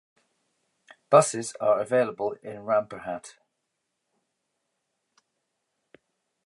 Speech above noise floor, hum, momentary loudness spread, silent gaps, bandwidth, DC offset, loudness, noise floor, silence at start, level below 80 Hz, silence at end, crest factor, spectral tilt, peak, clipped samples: 56 dB; none; 16 LU; none; 11.5 kHz; under 0.1%; -25 LUFS; -80 dBFS; 1.1 s; -76 dBFS; 3.15 s; 26 dB; -4.5 dB/octave; -4 dBFS; under 0.1%